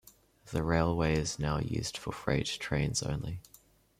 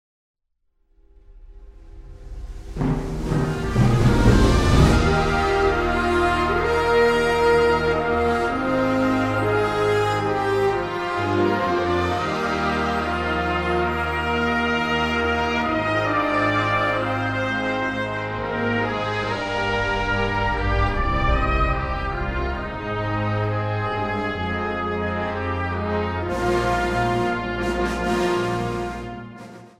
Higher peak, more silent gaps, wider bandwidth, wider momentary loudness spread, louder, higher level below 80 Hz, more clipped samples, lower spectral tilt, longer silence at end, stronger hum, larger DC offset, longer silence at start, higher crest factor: second, -14 dBFS vs -2 dBFS; neither; about the same, 15.5 kHz vs 15 kHz; about the same, 9 LU vs 8 LU; second, -32 LUFS vs -21 LUFS; second, -48 dBFS vs -30 dBFS; neither; about the same, -5 dB/octave vs -6 dB/octave; first, 0.6 s vs 0.1 s; neither; neither; second, 0.45 s vs 1.3 s; about the same, 20 dB vs 18 dB